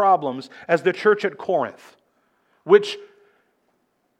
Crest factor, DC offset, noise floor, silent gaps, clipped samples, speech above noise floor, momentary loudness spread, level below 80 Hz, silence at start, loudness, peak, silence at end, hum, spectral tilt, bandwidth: 20 dB; under 0.1%; -68 dBFS; none; under 0.1%; 48 dB; 16 LU; -80 dBFS; 0 s; -21 LUFS; -2 dBFS; 1.15 s; none; -5.5 dB/octave; 9.2 kHz